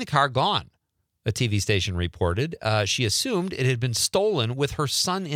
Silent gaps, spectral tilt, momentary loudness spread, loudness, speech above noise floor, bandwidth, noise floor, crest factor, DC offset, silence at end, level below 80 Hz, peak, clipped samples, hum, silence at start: none; -4 dB/octave; 5 LU; -24 LUFS; 50 dB; 16.5 kHz; -74 dBFS; 18 dB; under 0.1%; 0 s; -50 dBFS; -6 dBFS; under 0.1%; none; 0 s